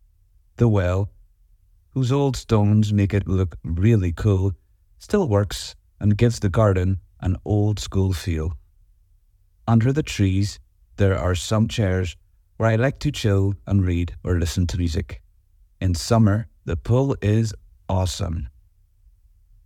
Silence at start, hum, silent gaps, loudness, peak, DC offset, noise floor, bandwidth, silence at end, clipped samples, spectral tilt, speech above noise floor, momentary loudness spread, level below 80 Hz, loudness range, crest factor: 0.6 s; none; none; -22 LUFS; -4 dBFS; under 0.1%; -58 dBFS; 13.5 kHz; 1.15 s; under 0.1%; -7 dB/octave; 38 dB; 11 LU; -38 dBFS; 3 LU; 18 dB